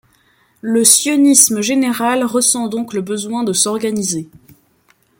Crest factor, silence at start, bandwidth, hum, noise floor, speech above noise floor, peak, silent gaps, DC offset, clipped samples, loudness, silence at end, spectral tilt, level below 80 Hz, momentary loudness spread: 16 dB; 0.65 s; 17 kHz; none; -56 dBFS; 42 dB; 0 dBFS; none; under 0.1%; under 0.1%; -13 LUFS; 0.95 s; -2.5 dB/octave; -60 dBFS; 12 LU